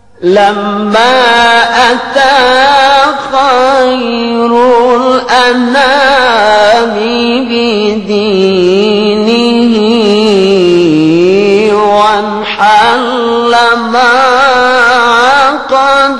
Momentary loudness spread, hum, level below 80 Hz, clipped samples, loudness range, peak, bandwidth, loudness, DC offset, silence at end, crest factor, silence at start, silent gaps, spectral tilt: 5 LU; none; -44 dBFS; 1%; 2 LU; 0 dBFS; 11.5 kHz; -7 LUFS; 1%; 0 s; 6 dB; 0.2 s; none; -4.5 dB/octave